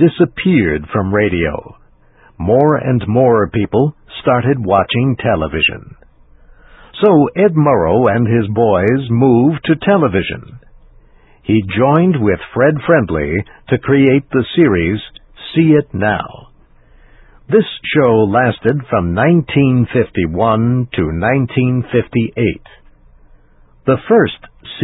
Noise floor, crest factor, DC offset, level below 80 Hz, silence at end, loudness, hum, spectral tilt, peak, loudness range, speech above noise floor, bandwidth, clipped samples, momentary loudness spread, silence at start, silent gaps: -47 dBFS; 14 dB; under 0.1%; -36 dBFS; 0 s; -13 LUFS; none; -11 dB/octave; 0 dBFS; 4 LU; 34 dB; 4.1 kHz; under 0.1%; 8 LU; 0 s; none